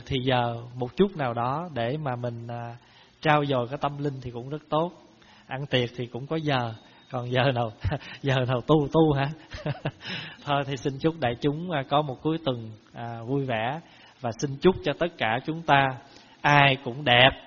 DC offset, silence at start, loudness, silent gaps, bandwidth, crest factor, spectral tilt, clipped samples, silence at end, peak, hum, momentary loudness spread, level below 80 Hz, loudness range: under 0.1%; 0 s; -26 LUFS; none; 7 kHz; 26 dB; -4 dB/octave; under 0.1%; 0 s; 0 dBFS; none; 14 LU; -52 dBFS; 5 LU